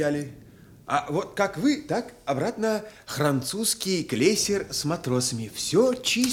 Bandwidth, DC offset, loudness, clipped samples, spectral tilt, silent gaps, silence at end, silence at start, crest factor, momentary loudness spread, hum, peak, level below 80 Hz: 17.5 kHz; under 0.1%; -26 LUFS; under 0.1%; -4 dB/octave; none; 0 s; 0 s; 18 dB; 8 LU; none; -6 dBFS; -58 dBFS